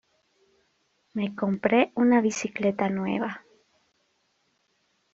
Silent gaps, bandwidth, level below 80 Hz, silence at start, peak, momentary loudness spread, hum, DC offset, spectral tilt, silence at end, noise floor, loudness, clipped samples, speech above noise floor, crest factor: none; 7.6 kHz; -70 dBFS; 1.15 s; -6 dBFS; 12 LU; none; under 0.1%; -5.5 dB/octave; 1.75 s; -71 dBFS; -25 LUFS; under 0.1%; 47 dB; 22 dB